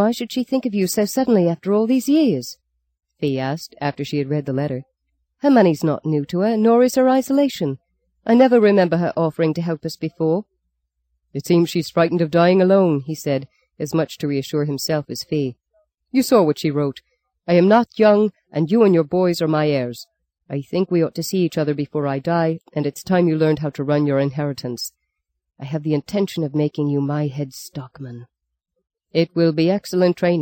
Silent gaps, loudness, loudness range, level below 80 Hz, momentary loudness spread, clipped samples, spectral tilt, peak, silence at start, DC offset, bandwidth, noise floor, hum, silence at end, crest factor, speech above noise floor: none; -19 LUFS; 7 LU; -62 dBFS; 12 LU; under 0.1%; -6.5 dB/octave; -2 dBFS; 0 s; under 0.1%; 17 kHz; -76 dBFS; none; 0 s; 16 dB; 58 dB